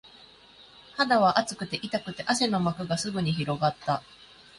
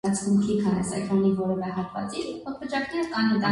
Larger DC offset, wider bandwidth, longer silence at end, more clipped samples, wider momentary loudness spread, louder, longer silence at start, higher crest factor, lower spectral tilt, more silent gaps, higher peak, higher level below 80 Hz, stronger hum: neither; about the same, 11.5 kHz vs 11.5 kHz; first, 0.35 s vs 0 s; neither; about the same, 10 LU vs 9 LU; about the same, -27 LUFS vs -26 LUFS; about the same, 0.05 s vs 0.05 s; first, 22 dB vs 14 dB; about the same, -4.5 dB/octave vs -5.5 dB/octave; neither; first, -6 dBFS vs -10 dBFS; about the same, -60 dBFS vs -56 dBFS; neither